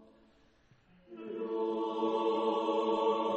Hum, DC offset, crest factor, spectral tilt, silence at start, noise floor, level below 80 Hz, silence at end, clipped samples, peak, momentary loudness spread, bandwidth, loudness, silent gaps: none; under 0.1%; 14 dB; -6 dB/octave; 1.1 s; -66 dBFS; -78 dBFS; 0 s; under 0.1%; -20 dBFS; 13 LU; 8 kHz; -33 LUFS; none